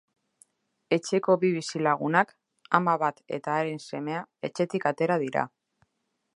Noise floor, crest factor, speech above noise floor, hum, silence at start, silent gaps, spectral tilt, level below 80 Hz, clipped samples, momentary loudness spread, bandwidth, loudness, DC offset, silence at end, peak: -78 dBFS; 24 dB; 52 dB; none; 0.9 s; none; -5.5 dB/octave; -78 dBFS; under 0.1%; 10 LU; 11.5 kHz; -27 LUFS; under 0.1%; 0.9 s; -4 dBFS